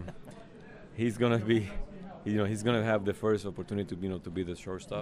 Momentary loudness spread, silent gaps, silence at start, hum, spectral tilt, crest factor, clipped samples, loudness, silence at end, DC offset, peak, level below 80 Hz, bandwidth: 20 LU; none; 0 s; none; -6.5 dB/octave; 18 dB; under 0.1%; -32 LUFS; 0 s; under 0.1%; -14 dBFS; -50 dBFS; 15 kHz